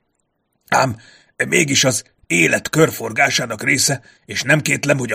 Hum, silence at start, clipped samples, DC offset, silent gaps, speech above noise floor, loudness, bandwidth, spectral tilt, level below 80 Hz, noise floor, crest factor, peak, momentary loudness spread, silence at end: none; 0.7 s; under 0.1%; under 0.1%; none; 52 dB; -16 LUFS; 15.5 kHz; -3 dB/octave; -56 dBFS; -69 dBFS; 18 dB; 0 dBFS; 10 LU; 0 s